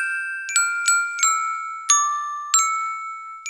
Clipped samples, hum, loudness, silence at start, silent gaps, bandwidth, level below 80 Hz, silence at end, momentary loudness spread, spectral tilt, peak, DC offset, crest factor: under 0.1%; none; -20 LUFS; 0 s; none; 16 kHz; -76 dBFS; 0 s; 10 LU; 11 dB/octave; -2 dBFS; under 0.1%; 20 dB